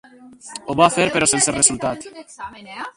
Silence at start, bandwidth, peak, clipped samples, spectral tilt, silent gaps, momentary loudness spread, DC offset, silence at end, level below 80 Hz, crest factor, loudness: 0.25 s; 11.5 kHz; 0 dBFS; under 0.1%; -2.5 dB/octave; none; 20 LU; under 0.1%; 0.05 s; -52 dBFS; 20 dB; -16 LUFS